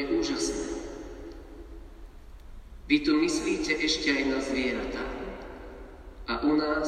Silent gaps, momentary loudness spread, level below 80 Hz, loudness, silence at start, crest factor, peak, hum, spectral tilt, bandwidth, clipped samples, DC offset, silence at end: none; 22 LU; -46 dBFS; -28 LUFS; 0 s; 20 dB; -10 dBFS; none; -3.5 dB/octave; 12 kHz; under 0.1%; under 0.1%; 0 s